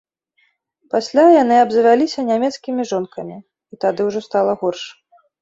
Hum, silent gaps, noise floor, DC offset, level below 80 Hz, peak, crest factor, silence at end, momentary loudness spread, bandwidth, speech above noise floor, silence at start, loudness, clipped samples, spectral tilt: none; none; -63 dBFS; under 0.1%; -64 dBFS; -2 dBFS; 16 dB; 0.5 s; 17 LU; 8 kHz; 47 dB; 0.95 s; -16 LUFS; under 0.1%; -5 dB/octave